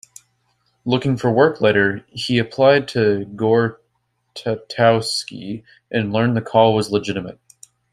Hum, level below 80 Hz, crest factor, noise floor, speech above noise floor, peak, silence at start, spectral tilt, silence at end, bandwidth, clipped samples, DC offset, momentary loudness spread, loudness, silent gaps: none; -56 dBFS; 18 dB; -69 dBFS; 51 dB; -2 dBFS; 0.85 s; -6 dB/octave; 0.6 s; 15 kHz; under 0.1%; under 0.1%; 14 LU; -18 LUFS; none